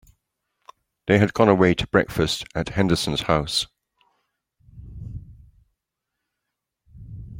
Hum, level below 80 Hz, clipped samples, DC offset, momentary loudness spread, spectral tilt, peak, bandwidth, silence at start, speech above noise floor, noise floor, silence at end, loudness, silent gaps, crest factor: none; -46 dBFS; under 0.1%; under 0.1%; 23 LU; -5.5 dB/octave; -2 dBFS; 16.5 kHz; 1.05 s; 62 dB; -82 dBFS; 0 s; -21 LUFS; none; 22 dB